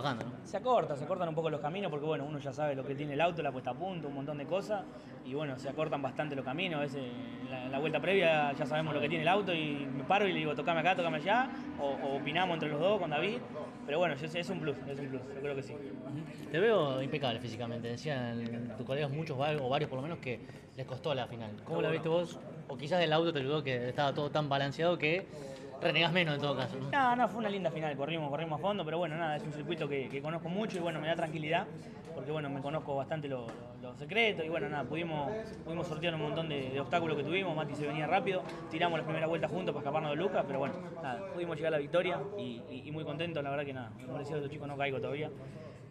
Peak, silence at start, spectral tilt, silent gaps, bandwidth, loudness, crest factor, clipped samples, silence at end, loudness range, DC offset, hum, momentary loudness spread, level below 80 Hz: -16 dBFS; 0 s; -6.5 dB/octave; none; 12 kHz; -35 LUFS; 20 dB; under 0.1%; 0 s; 5 LU; under 0.1%; none; 12 LU; -68 dBFS